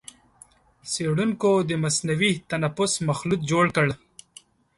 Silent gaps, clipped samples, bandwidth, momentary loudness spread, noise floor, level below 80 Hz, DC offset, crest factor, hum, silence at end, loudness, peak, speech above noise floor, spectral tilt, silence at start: none; under 0.1%; 11.5 kHz; 6 LU; -55 dBFS; -56 dBFS; under 0.1%; 18 dB; none; 0.8 s; -23 LUFS; -8 dBFS; 31 dB; -4.5 dB/octave; 0.85 s